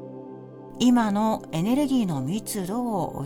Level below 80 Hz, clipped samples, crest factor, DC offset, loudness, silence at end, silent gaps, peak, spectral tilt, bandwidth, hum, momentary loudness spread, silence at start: -54 dBFS; under 0.1%; 16 dB; under 0.1%; -24 LUFS; 0 s; none; -10 dBFS; -6 dB/octave; 17.5 kHz; none; 20 LU; 0 s